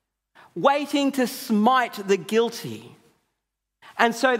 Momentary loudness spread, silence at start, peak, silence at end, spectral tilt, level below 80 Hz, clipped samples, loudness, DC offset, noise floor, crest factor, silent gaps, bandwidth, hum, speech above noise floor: 17 LU; 0.55 s; -2 dBFS; 0 s; -4.5 dB/octave; -78 dBFS; under 0.1%; -22 LUFS; under 0.1%; -81 dBFS; 22 dB; none; 16 kHz; none; 59 dB